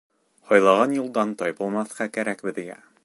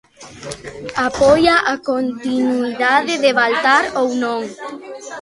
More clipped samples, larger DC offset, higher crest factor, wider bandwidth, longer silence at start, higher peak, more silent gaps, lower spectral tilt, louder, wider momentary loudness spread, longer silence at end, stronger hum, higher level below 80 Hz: neither; neither; about the same, 20 dB vs 16 dB; about the same, 11.5 kHz vs 11.5 kHz; first, 0.5 s vs 0.2 s; second, -4 dBFS vs 0 dBFS; neither; first, -5 dB/octave vs -3.5 dB/octave; second, -23 LUFS vs -16 LUFS; second, 14 LU vs 18 LU; first, 0.3 s vs 0 s; neither; second, -74 dBFS vs -48 dBFS